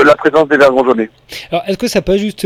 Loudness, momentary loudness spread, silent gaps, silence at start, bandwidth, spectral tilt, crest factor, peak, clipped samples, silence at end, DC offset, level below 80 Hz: -12 LUFS; 11 LU; none; 0 s; 16 kHz; -5 dB/octave; 12 dB; 0 dBFS; 0.7%; 0 s; under 0.1%; -38 dBFS